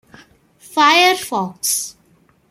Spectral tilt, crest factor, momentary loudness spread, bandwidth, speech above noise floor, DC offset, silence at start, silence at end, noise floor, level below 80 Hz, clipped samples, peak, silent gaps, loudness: -1.5 dB/octave; 18 dB; 13 LU; 16 kHz; 40 dB; under 0.1%; 0.7 s; 0.6 s; -55 dBFS; -66 dBFS; under 0.1%; 0 dBFS; none; -15 LUFS